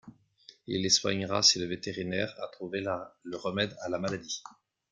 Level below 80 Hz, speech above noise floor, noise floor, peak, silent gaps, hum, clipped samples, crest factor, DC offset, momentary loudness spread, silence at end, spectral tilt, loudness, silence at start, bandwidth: -68 dBFS; 27 dB; -59 dBFS; -8 dBFS; none; none; under 0.1%; 24 dB; under 0.1%; 15 LU; 0.45 s; -2.5 dB/octave; -30 LUFS; 0.05 s; 11.5 kHz